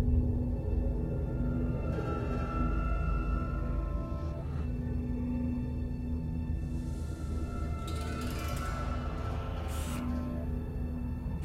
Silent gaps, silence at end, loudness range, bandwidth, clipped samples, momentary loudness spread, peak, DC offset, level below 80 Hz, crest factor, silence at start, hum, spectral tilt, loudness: none; 0 s; 3 LU; 14 kHz; under 0.1%; 4 LU; -16 dBFS; under 0.1%; -36 dBFS; 16 dB; 0 s; none; -7.5 dB/octave; -35 LUFS